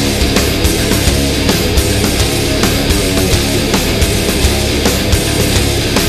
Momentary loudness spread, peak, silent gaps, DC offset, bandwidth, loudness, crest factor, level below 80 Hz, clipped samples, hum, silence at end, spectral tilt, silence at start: 1 LU; 0 dBFS; none; under 0.1%; 14.5 kHz; -12 LUFS; 12 dB; -18 dBFS; under 0.1%; none; 0 s; -4 dB/octave; 0 s